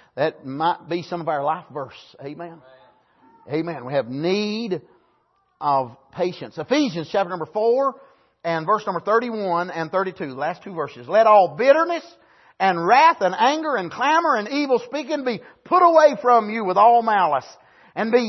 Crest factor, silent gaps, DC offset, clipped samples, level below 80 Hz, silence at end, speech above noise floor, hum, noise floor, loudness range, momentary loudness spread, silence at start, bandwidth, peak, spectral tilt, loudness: 18 dB; none; under 0.1%; under 0.1%; -72 dBFS; 0 s; 45 dB; none; -65 dBFS; 10 LU; 15 LU; 0.15 s; 6.2 kHz; -4 dBFS; -5.5 dB/octave; -20 LUFS